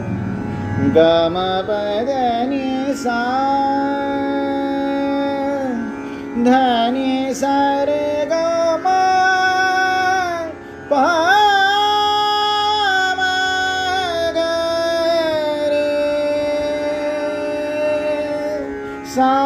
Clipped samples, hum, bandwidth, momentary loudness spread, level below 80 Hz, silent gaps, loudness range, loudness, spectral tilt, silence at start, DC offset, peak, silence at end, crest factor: under 0.1%; none; 14.5 kHz; 9 LU; -48 dBFS; none; 4 LU; -17 LUFS; -4.5 dB/octave; 0 s; under 0.1%; -2 dBFS; 0 s; 16 dB